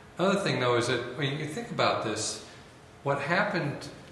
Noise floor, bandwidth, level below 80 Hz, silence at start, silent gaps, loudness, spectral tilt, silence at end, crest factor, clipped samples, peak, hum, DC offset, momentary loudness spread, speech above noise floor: -51 dBFS; 12.5 kHz; -64 dBFS; 0 s; none; -29 LUFS; -4.5 dB/octave; 0 s; 20 dB; under 0.1%; -10 dBFS; none; under 0.1%; 10 LU; 22 dB